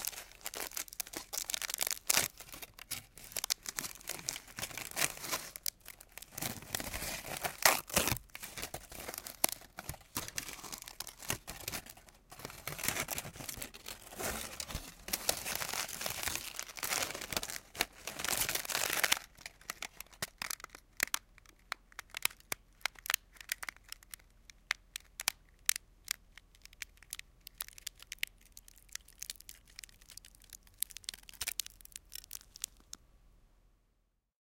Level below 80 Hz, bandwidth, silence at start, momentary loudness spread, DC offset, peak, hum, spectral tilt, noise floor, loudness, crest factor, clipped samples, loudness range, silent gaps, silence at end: -60 dBFS; 17 kHz; 0 s; 17 LU; under 0.1%; -2 dBFS; none; -0.5 dB/octave; -78 dBFS; -38 LUFS; 38 dB; under 0.1%; 10 LU; none; 1 s